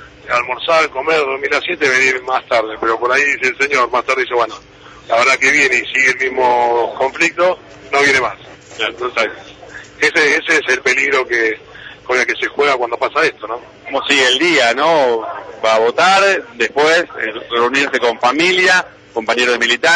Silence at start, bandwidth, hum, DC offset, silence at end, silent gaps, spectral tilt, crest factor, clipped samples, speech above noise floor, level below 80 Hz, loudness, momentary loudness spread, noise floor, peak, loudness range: 0 s; 10.5 kHz; none; under 0.1%; 0 s; none; -2 dB/octave; 14 dB; under 0.1%; 21 dB; -54 dBFS; -13 LUFS; 11 LU; -35 dBFS; -2 dBFS; 3 LU